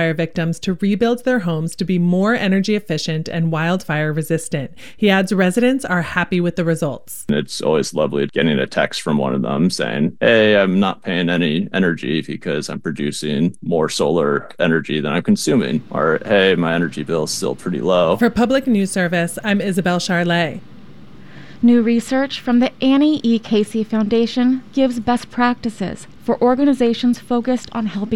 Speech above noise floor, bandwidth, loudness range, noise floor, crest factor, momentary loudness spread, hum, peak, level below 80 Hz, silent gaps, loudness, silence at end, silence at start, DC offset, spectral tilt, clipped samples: 24 dB; 16 kHz; 2 LU; -41 dBFS; 16 dB; 7 LU; none; -2 dBFS; -50 dBFS; none; -18 LUFS; 0 s; 0 s; 1%; -5.5 dB/octave; under 0.1%